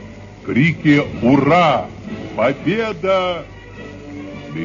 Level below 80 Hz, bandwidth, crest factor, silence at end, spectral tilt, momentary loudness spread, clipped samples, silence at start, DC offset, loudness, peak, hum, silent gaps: -44 dBFS; 7.4 kHz; 16 dB; 0 s; -7 dB/octave; 21 LU; under 0.1%; 0 s; under 0.1%; -16 LUFS; 0 dBFS; none; none